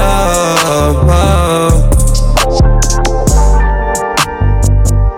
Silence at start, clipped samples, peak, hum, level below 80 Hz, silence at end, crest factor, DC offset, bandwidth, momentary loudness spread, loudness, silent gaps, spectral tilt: 0 s; under 0.1%; 0 dBFS; none; -10 dBFS; 0 s; 8 dB; under 0.1%; 16.5 kHz; 3 LU; -11 LUFS; none; -5 dB/octave